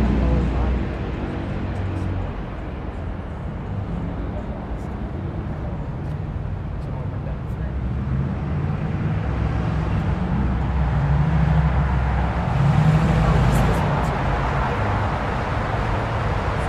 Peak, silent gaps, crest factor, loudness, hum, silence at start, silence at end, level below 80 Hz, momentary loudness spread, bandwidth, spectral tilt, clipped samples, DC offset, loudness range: -6 dBFS; none; 16 dB; -23 LUFS; none; 0 s; 0 s; -26 dBFS; 11 LU; 11.5 kHz; -8 dB/octave; under 0.1%; under 0.1%; 9 LU